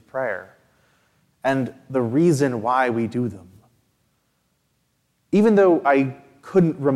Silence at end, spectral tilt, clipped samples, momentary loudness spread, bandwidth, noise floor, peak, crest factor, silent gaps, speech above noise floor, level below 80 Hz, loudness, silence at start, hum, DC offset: 0 s; -7.5 dB/octave; under 0.1%; 11 LU; 13 kHz; -69 dBFS; -6 dBFS; 16 dB; none; 49 dB; -66 dBFS; -20 LUFS; 0.15 s; none; under 0.1%